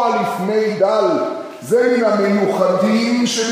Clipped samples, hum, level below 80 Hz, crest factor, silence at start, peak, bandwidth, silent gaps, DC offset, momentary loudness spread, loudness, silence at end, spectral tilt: under 0.1%; none; -70 dBFS; 14 dB; 0 s; -2 dBFS; 15.5 kHz; none; under 0.1%; 4 LU; -16 LUFS; 0 s; -4.5 dB/octave